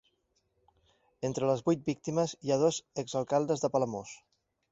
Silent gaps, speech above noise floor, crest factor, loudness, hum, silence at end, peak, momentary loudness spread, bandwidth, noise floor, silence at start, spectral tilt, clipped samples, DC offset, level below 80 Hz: none; 45 dB; 18 dB; -31 LUFS; none; 0.55 s; -14 dBFS; 9 LU; 8 kHz; -76 dBFS; 1.2 s; -5.5 dB/octave; under 0.1%; under 0.1%; -70 dBFS